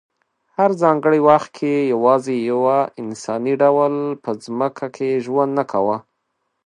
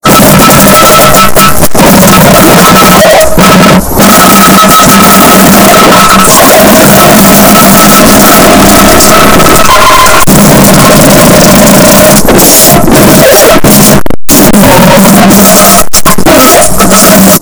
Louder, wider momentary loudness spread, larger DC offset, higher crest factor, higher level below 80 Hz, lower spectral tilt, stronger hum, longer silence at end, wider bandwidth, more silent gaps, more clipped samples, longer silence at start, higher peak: second, -18 LUFS vs 0 LUFS; first, 10 LU vs 2 LU; second, under 0.1% vs 10%; first, 18 dB vs 2 dB; second, -70 dBFS vs -20 dBFS; first, -7 dB/octave vs -3.5 dB/octave; neither; first, 0.65 s vs 0 s; second, 10.5 kHz vs over 20 kHz; neither; second, under 0.1% vs 90%; first, 0.6 s vs 0 s; about the same, 0 dBFS vs 0 dBFS